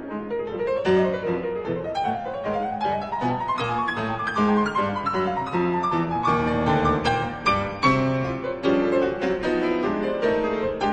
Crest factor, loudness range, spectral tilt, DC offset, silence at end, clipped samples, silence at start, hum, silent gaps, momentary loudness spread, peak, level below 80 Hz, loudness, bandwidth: 16 dB; 3 LU; -7 dB/octave; under 0.1%; 0 s; under 0.1%; 0 s; none; none; 6 LU; -6 dBFS; -46 dBFS; -24 LUFS; 9.6 kHz